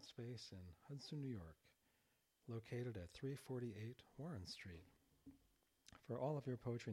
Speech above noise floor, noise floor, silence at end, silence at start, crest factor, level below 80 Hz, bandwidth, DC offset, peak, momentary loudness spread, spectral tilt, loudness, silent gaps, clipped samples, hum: 33 dB; -83 dBFS; 0 s; 0 s; 20 dB; -76 dBFS; 16 kHz; under 0.1%; -32 dBFS; 18 LU; -6.5 dB/octave; -51 LUFS; none; under 0.1%; none